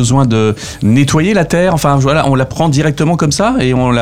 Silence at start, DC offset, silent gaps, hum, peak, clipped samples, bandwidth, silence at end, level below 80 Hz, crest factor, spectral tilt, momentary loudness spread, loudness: 0 s; 1%; none; none; 0 dBFS; under 0.1%; 15.5 kHz; 0 s; -34 dBFS; 10 dB; -6 dB/octave; 3 LU; -11 LUFS